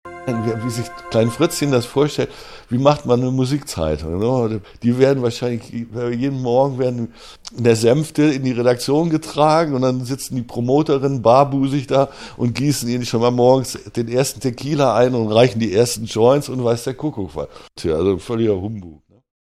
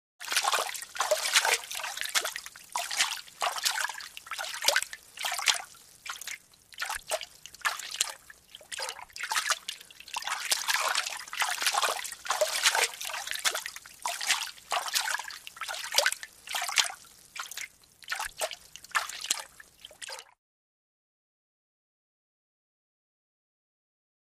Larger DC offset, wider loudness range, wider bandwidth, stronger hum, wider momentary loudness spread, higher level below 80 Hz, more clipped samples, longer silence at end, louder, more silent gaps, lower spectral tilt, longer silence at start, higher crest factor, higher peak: neither; second, 3 LU vs 7 LU; about the same, 14.5 kHz vs 15.5 kHz; neither; second, 10 LU vs 15 LU; first, -46 dBFS vs -70 dBFS; neither; second, 0.55 s vs 4.05 s; first, -18 LUFS vs -30 LUFS; neither; first, -6 dB/octave vs 3 dB/octave; second, 0.05 s vs 0.2 s; second, 18 dB vs 30 dB; first, 0 dBFS vs -4 dBFS